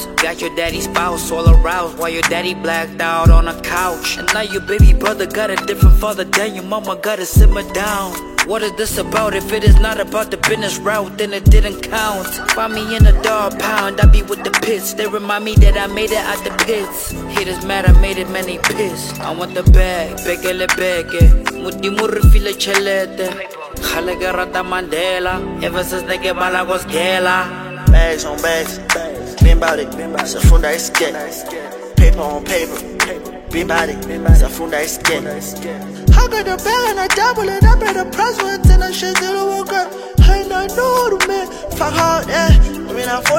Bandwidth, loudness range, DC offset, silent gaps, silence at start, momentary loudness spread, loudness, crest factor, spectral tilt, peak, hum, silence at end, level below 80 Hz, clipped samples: 16.5 kHz; 3 LU; under 0.1%; none; 0 s; 8 LU; -15 LUFS; 14 dB; -4.5 dB/octave; 0 dBFS; none; 0 s; -16 dBFS; under 0.1%